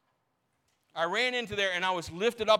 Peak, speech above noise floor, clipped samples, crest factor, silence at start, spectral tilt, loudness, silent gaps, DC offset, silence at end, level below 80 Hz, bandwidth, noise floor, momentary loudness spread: -10 dBFS; 48 dB; under 0.1%; 22 dB; 0.95 s; -3 dB/octave; -30 LUFS; none; under 0.1%; 0 s; -64 dBFS; 16 kHz; -77 dBFS; 5 LU